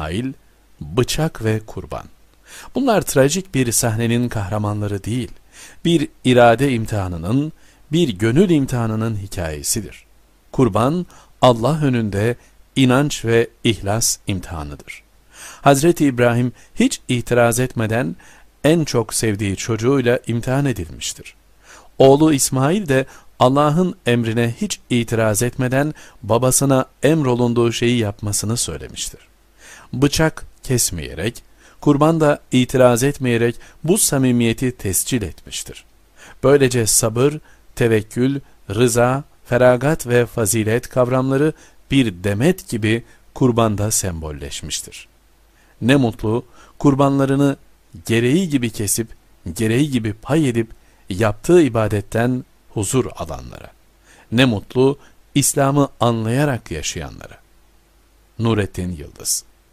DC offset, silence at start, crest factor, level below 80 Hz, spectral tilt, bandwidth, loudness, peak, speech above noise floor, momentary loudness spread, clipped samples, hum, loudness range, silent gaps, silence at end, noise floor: under 0.1%; 0 s; 18 dB; -40 dBFS; -5 dB/octave; 15.5 kHz; -18 LUFS; 0 dBFS; 36 dB; 13 LU; under 0.1%; none; 4 LU; none; 0.3 s; -53 dBFS